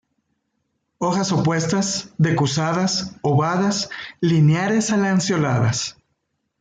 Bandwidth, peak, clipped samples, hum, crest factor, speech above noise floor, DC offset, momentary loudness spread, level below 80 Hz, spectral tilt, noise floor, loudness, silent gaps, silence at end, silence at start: 9.4 kHz; -6 dBFS; under 0.1%; none; 14 dB; 54 dB; under 0.1%; 7 LU; -58 dBFS; -5 dB/octave; -73 dBFS; -20 LUFS; none; 0.7 s; 1 s